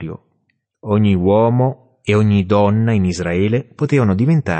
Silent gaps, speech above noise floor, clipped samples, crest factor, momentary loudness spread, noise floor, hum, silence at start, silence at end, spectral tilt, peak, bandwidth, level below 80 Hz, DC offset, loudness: none; 52 dB; under 0.1%; 12 dB; 8 LU; -67 dBFS; none; 0 s; 0 s; -8 dB/octave; -2 dBFS; 8.6 kHz; -46 dBFS; under 0.1%; -16 LUFS